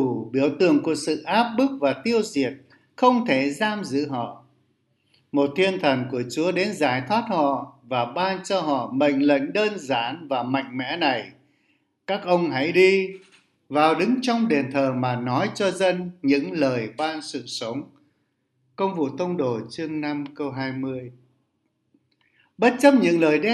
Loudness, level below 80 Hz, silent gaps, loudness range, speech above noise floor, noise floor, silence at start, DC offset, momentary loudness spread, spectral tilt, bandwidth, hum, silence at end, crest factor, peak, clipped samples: -23 LUFS; -72 dBFS; none; 7 LU; 50 dB; -72 dBFS; 0 s; under 0.1%; 11 LU; -5.5 dB/octave; 12 kHz; none; 0 s; 22 dB; -2 dBFS; under 0.1%